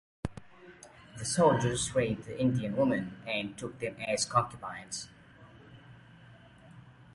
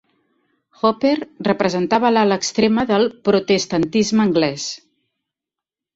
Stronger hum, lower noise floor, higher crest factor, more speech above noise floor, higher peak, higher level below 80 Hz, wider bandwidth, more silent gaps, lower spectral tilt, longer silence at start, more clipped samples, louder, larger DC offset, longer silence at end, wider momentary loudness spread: neither; second, -55 dBFS vs -87 dBFS; first, 22 dB vs 16 dB; second, 24 dB vs 69 dB; second, -12 dBFS vs -2 dBFS; about the same, -58 dBFS vs -56 dBFS; first, 11.5 kHz vs 8 kHz; neither; about the same, -4.5 dB/octave vs -4.5 dB/octave; second, 0.25 s vs 0.85 s; neither; second, -31 LUFS vs -18 LUFS; neither; second, 0.05 s vs 1.2 s; first, 22 LU vs 6 LU